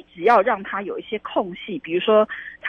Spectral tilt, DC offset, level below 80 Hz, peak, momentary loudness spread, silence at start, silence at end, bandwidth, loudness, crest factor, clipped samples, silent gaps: -6.5 dB/octave; under 0.1%; -62 dBFS; -4 dBFS; 12 LU; 0.15 s; 0 s; 6.6 kHz; -21 LUFS; 18 dB; under 0.1%; none